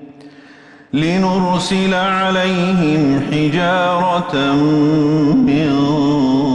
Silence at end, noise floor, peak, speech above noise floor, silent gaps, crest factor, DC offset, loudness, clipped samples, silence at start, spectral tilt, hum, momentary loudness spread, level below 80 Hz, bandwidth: 0 s; -42 dBFS; -4 dBFS; 28 dB; none; 10 dB; under 0.1%; -15 LUFS; under 0.1%; 0 s; -6.5 dB/octave; none; 3 LU; -44 dBFS; 11 kHz